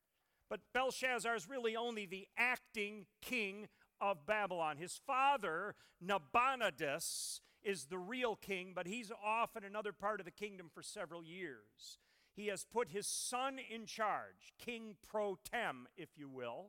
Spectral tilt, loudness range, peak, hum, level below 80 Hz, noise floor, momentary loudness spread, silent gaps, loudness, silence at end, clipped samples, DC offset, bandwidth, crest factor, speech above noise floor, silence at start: -2.5 dB/octave; 6 LU; -20 dBFS; none; -78 dBFS; -83 dBFS; 15 LU; none; -41 LUFS; 0 s; under 0.1%; under 0.1%; 17.5 kHz; 22 dB; 41 dB; 0.5 s